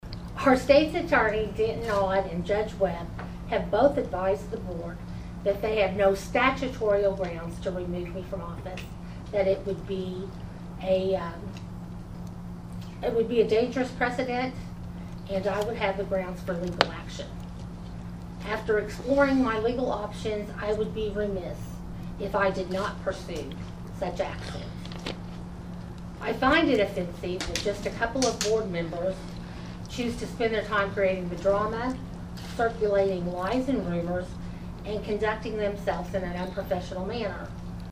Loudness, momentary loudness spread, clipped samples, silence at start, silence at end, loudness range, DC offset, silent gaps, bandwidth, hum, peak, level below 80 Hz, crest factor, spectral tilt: -28 LUFS; 16 LU; under 0.1%; 0.05 s; 0 s; 5 LU; under 0.1%; none; 15.5 kHz; none; 0 dBFS; -44 dBFS; 28 dB; -5.5 dB/octave